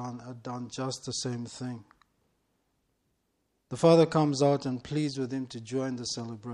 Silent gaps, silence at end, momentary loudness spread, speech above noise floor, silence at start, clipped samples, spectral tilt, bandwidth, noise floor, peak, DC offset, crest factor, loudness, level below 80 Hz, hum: none; 0 s; 17 LU; 48 dB; 0 s; under 0.1%; -6 dB/octave; 11.5 kHz; -77 dBFS; -8 dBFS; under 0.1%; 22 dB; -29 LUFS; -66 dBFS; none